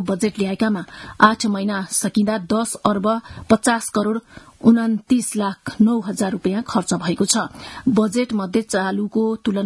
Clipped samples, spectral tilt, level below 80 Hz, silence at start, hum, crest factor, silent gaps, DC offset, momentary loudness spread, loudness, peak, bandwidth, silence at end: under 0.1%; -4.5 dB/octave; -54 dBFS; 0 s; none; 20 dB; none; under 0.1%; 7 LU; -20 LUFS; 0 dBFS; 12 kHz; 0 s